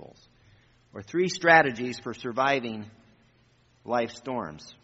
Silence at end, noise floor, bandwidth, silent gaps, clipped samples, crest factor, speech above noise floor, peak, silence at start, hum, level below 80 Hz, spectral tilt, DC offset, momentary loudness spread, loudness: 0.1 s; -63 dBFS; 8 kHz; none; under 0.1%; 24 dB; 36 dB; -4 dBFS; 0 s; none; -66 dBFS; -3 dB/octave; under 0.1%; 25 LU; -26 LUFS